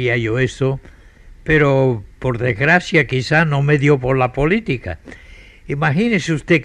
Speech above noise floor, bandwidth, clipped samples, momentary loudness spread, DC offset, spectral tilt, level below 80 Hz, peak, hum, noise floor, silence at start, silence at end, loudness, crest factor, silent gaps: 26 dB; 9.8 kHz; under 0.1%; 10 LU; under 0.1%; -6.5 dB/octave; -38 dBFS; -2 dBFS; none; -42 dBFS; 0 s; 0 s; -16 LUFS; 16 dB; none